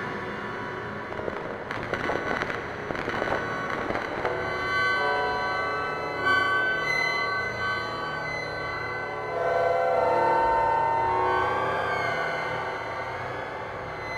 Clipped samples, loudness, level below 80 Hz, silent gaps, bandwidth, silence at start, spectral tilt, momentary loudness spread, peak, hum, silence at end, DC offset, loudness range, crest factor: under 0.1%; -27 LUFS; -52 dBFS; none; 14.5 kHz; 0 s; -5 dB/octave; 10 LU; -8 dBFS; none; 0 s; under 0.1%; 5 LU; 18 dB